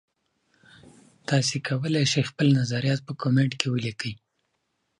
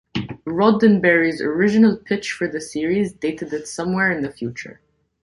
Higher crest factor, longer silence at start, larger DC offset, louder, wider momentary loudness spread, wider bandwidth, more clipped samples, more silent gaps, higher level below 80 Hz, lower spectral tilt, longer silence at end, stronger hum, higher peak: first, 24 dB vs 18 dB; first, 1.3 s vs 0.15 s; neither; second, -25 LUFS vs -19 LUFS; second, 11 LU vs 14 LU; about the same, 11 kHz vs 11.5 kHz; neither; neither; second, -64 dBFS vs -54 dBFS; about the same, -5 dB/octave vs -6 dB/octave; first, 0.85 s vs 0.5 s; neither; about the same, -2 dBFS vs -2 dBFS